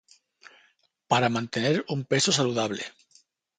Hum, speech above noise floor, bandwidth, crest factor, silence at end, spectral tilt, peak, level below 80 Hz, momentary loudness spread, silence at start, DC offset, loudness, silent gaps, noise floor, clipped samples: none; 40 dB; 9.6 kHz; 22 dB; 0.7 s; -4 dB/octave; -6 dBFS; -68 dBFS; 8 LU; 1.1 s; under 0.1%; -25 LUFS; none; -66 dBFS; under 0.1%